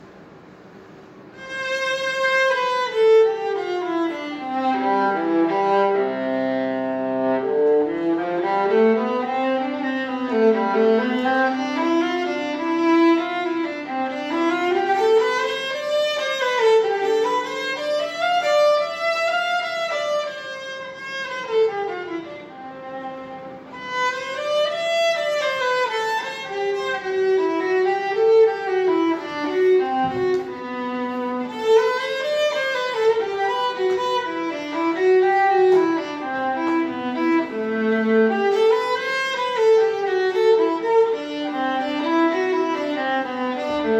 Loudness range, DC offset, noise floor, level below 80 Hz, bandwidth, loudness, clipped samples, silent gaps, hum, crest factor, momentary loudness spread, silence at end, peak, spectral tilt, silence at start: 4 LU; under 0.1%; -44 dBFS; -66 dBFS; 12.5 kHz; -21 LUFS; under 0.1%; none; none; 14 dB; 9 LU; 0 s; -6 dBFS; -4 dB/octave; 0 s